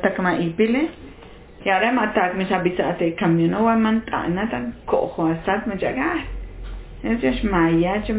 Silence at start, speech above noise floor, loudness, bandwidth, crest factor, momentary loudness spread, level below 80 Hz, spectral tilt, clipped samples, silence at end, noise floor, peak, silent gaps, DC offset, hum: 0 s; 22 dB; -21 LUFS; 4 kHz; 16 dB; 10 LU; -38 dBFS; -10.5 dB/octave; under 0.1%; 0 s; -42 dBFS; -6 dBFS; none; under 0.1%; none